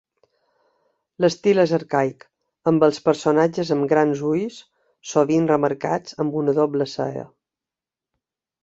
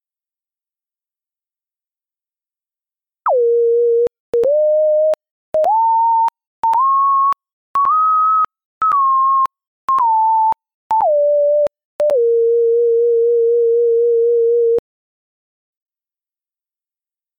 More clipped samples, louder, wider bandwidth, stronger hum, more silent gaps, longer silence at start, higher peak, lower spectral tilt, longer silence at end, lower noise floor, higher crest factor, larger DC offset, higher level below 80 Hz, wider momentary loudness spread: neither; second, -21 LUFS vs -15 LUFS; first, 8 kHz vs 4.5 kHz; neither; second, none vs 4.20-4.33 s, 5.31-5.53 s, 6.47-6.63 s, 7.53-7.74 s, 8.65-8.81 s, 9.67-9.88 s, 10.74-10.90 s, 11.85-11.99 s; second, 1.2 s vs 3.25 s; first, -2 dBFS vs -10 dBFS; first, -6.5 dB/octave vs -5 dB/octave; second, 1.4 s vs 2.6 s; about the same, -89 dBFS vs under -90 dBFS; first, 20 dB vs 6 dB; neither; about the same, -64 dBFS vs -64 dBFS; about the same, 8 LU vs 7 LU